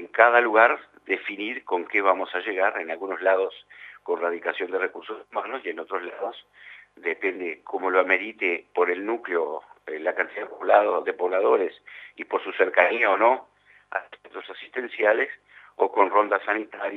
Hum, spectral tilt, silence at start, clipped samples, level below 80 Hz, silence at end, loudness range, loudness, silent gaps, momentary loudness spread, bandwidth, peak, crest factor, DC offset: 50 Hz at -75 dBFS; -5 dB/octave; 0 s; under 0.1%; -80 dBFS; 0 s; 8 LU; -24 LUFS; none; 15 LU; 6 kHz; 0 dBFS; 24 dB; under 0.1%